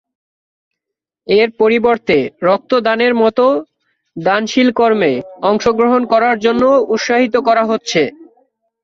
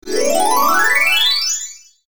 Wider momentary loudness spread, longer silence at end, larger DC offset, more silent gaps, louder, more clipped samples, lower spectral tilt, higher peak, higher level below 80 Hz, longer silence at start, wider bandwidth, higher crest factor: second, 5 LU vs 9 LU; first, 0.6 s vs 0.05 s; neither; neither; about the same, -13 LUFS vs -13 LUFS; neither; first, -5 dB/octave vs 0.5 dB/octave; first, 0 dBFS vs -4 dBFS; first, -52 dBFS vs -58 dBFS; first, 1.3 s vs 0 s; second, 7.6 kHz vs over 20 kHz; about the same, 14 dB vs 12 dB